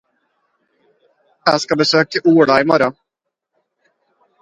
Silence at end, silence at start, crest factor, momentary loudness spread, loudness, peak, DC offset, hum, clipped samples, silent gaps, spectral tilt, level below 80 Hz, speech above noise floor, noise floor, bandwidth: 1.5 s; 1.45 s; 18 dB; 6 LU; -14 LUFS; 0 dBFS; under 0.1%; none; under 0.1%; none; -5 dB/octave; -60 dBFS; 66 dB; -79 dBFS; 9.2 kHz